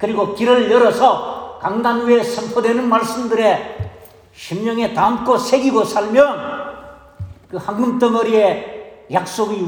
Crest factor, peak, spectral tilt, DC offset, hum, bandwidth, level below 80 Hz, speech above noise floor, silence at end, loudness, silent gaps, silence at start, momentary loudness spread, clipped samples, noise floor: 16 dB; -2 dBFS; -5 dB/octave; under 0.1%; none; over 20 kHz; -52 dBFS; 26 dB; 0 s; -16 LUFS; none; 0 s; 17 LU; under 0.1%; -41 dBFS